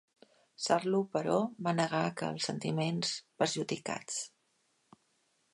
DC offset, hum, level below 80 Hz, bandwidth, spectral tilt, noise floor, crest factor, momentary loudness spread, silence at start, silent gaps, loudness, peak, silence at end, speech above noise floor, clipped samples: under 0.1%; none; -78 dBFS; 11.5 kHz; -4.5 dB/octave; -75 dBFS; 22 dB; 7 LU; 0.6 s; none; -33 LUFS; -14 dBFS; 1.25 s; 42 dB; under 0.1%